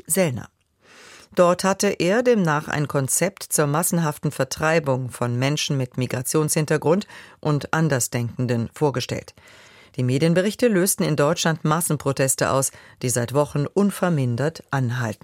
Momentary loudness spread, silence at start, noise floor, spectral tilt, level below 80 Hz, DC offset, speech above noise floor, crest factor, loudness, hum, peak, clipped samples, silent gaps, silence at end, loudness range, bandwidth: 6 LU; 0.1 s; -51 dBFS; -5 dB/octave; -58 dBFS; under 0.1%; 30 dB; 18 dB; -22 LUFS; none; -4 dBFS; under 0.1%; none; 0.1 s; 2 LU; 16.5 kHz